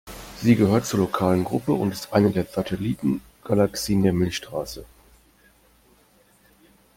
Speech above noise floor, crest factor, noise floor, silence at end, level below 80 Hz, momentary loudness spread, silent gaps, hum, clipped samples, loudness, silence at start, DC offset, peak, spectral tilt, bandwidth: 36 dB; 18 dB; -58 dBFS; 2.1 s; -50 dBFS; 11 LU; none; none; under 0.1%; -23 LUFS; 0.05 s; under 0.1%; -6 dBFS; -6.5 dB/octave; 17 kHz